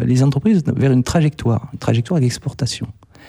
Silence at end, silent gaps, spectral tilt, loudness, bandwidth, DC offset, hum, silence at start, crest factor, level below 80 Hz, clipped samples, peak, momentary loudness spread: 0.35 s; none; -7 dB/octave; -18 LUFS; 13 kHz; under 0.1%; none; 0 s; 14 dB; -42 dBFS; under 0.1%; -2 dBFS; 8 LU